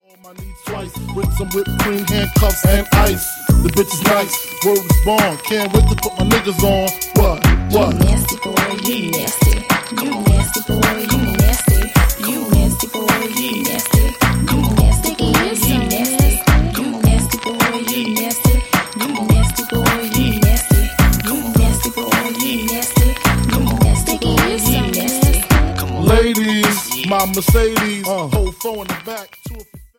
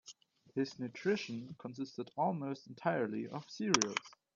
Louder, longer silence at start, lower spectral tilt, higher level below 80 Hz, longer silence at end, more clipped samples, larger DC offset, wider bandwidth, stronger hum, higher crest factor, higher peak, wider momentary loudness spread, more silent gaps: first, -15 LUFS vs -38 LUFS; first, 0.25 s vs 0.05 s; about the same, -4.5 dB/octave vs -3.5 dB/octave; first, -20 dBFS vs -80 dBFS; about the same, 0.15 s vs 0.25 s; neither; neither; first, 17 kHz vs 8.2 kHz; neither; second, 14 dB vs 28 dB; first, 0 dBFS vs -10 dBFS; second, 6 LU vs 13 LU; neither